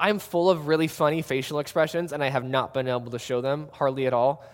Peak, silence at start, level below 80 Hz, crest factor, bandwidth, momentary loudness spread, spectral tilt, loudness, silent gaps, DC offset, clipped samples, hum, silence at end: -4 dBFS; 0 s; -64 dBFS; 20 dB; 17 kHz; 5 LU; -5.5 dB/octave; -25 LUFS; none; under 0.1%; under 0.1%; none; 0 s